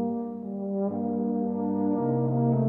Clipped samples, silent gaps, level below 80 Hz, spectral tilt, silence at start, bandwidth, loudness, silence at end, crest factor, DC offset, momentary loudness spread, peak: under 0.1%; none; -70 dBFS; -14.5 dB/octave; 0 s; 2.2 kHz; -28 LUFS; 0 s; 14 dB; under 0.1%; 7 LU; -14 dBFS